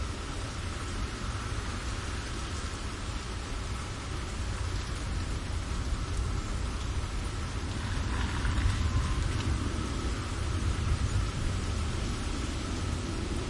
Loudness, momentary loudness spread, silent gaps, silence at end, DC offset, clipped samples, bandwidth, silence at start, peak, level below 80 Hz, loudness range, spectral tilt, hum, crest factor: -34 LUFS; 6 LU; none; 0 s; under 0.1%; under 0.1%; 11.5 kHz; 0 s; -16 dBFS; -36 dBFS; 4 LU; -5 dB/octave; none; 16 dB